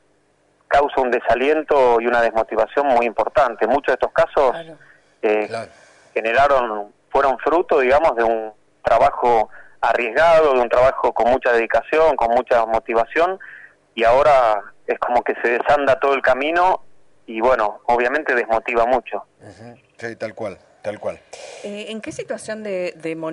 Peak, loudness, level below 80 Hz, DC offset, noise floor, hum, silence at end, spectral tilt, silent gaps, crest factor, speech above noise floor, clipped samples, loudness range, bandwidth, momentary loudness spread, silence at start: -8 dBFS; -18 LUFS; -46 dBFS; under 0.1%; -60 dBFS; none; 0 s; -5 dB/octave; none; 10 dB; 43 dB; under 0.1%; 7 LU; 11 kHz; 15 LU; 0.7 s